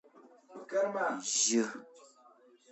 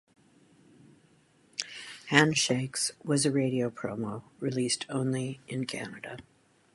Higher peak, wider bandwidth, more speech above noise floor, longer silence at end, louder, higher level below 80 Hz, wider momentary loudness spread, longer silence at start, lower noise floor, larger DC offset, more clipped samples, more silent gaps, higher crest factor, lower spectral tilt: second, -18 dBFS vs -4 dBFS; second, 8.4 kHz vs 11.5 kHz; second, 30 dB vs 34 dB; about the same, 0.65 s vs 0.55 s; about the same, -31 LUFS vs -30 LUFS; second, under -90 dBFS vs -70 dBFS; first, 23 LU vs 16 LU; second, 0.5 s vs 1.6 s; about the same, -62 dBFS vs -64 dBFS; neither; neither; neither; second, 18 dB vs 28 dB; second, -1.5 dB/octave vs -4 dB/octave